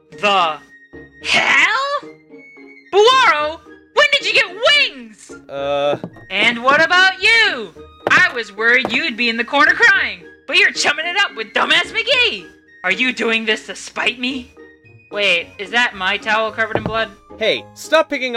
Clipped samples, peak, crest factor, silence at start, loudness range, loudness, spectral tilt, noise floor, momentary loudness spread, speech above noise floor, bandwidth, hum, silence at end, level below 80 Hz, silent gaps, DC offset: under 0.1%; 0 dBFS; 16 dB; 0.1 s; 5 LU; -15 LUFS; -2 dB/octave; -44 dBFS; 13 LU; 28 dB; 15 kHz; none; 0 s; -52 dBFS; none; under 0.1%